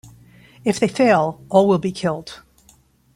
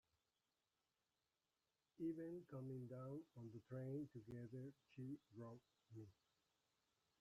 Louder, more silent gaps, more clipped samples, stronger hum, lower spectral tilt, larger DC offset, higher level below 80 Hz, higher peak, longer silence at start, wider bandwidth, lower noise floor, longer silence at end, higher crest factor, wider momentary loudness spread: first, -18 LUFS vs -55 LUFS; neither; neither; neither; second, -6 dB/octave vs -9.5 dB/octave; neither; first, -56 dBFS vs -88 dBFS; first, -2 dBFS vs -40 dBFS; second, 0.65 s vs 2 s; first, 15 kHz vs 13 kHz; second, -55 dBFS vs under -90 dBFS; second, 0.8 s vs 1.1 s; about the same, 18 dB vs 18 dB; about the same, 11 LU vs 12 LU